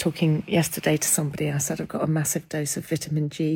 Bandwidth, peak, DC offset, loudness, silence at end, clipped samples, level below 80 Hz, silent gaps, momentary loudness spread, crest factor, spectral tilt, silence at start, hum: 17 kHz; -6 dBFS; under 0.1%; -24 LUFS; 0 s; under 0.1%; -58 dBFS; none; 6 LU; 18 dB; -4.5 dB/octave; 0 s; none